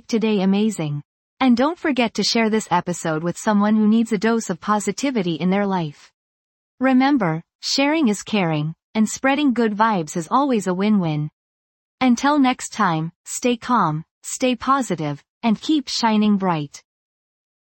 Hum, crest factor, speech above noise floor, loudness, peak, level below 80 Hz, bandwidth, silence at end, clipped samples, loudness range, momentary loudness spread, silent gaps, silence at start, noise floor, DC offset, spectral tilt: none; 16 dB; over 71 dB; -20 LUFS; -4 dBFS; -60 dBFS; 17 kHz; 1 s; under 0.1%; 2 LU; 8 LU; 1.05-1.37 s, 6.14-6.78 s, 7.55-7.59 s, 8.84-8.94 s, 11.33-11.98 s, 13.15-13.24 s, 14.11-14.21 s, 15.29-15.41 s; 0.1 s; under -90 dBFS; under 0.1%; -5 dB/octave